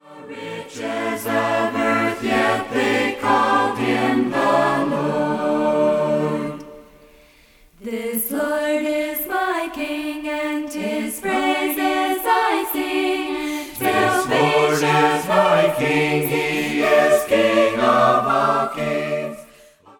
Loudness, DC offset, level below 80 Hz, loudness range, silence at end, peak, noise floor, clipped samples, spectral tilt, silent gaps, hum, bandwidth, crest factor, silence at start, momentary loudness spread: -19 LUFS; under 0.1%; -54 dBFS; 6 LU; 0.55 s; -2 dBFS; -51 dBFS; under 0.1%; -4.5 dB/octave; none; none; 19 kHz; 16 dB; 0.05 s; 9 LU